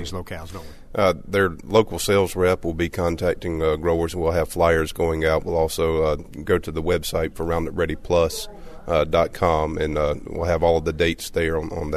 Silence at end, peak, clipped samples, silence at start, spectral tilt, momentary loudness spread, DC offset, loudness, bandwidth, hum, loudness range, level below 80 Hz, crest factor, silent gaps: 0 s; -4 dBFS; under 0.1%; 0 s; -5.5 dB/octave; 7 LU; under 0.1%; -22 LUFS; 13.5 kHz; none; 2 LU; -36 dBFS; 18 dB; none